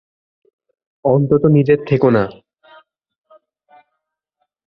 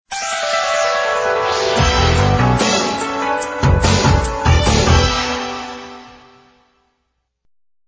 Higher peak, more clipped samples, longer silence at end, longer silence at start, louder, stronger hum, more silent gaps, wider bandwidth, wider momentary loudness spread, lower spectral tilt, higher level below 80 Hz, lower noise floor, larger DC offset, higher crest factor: about the same, -2 dBFS vs 0 dBFS; neither; first, 2.35 s vs 1.75 s; first, 1.05 s vs 0.1 s; about the same, -15 LUFS vs -15 LUFS; neither; neither; second, 5.6 kHz vs 8 kHz; about the same, 8 LU vs 8 LU; first, -11 dB/octave vs -4.5 dB/octave; second, -52 dBFS vs -24 dBFS; first, -76 dBFS vs -70 dBFS; neither; about the same, 16 dB vs 16 dB